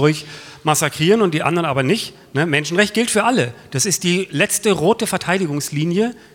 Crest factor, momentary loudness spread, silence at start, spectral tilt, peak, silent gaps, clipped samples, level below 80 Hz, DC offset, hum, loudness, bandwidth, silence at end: 18 dB; 6 LU; 0 s; -4 dB/octave; 0 dBFS; none; under 0.1%; -58 dBFS; under 0.1%; none; -18 LUFS; 17.5 kHz; 0.15 s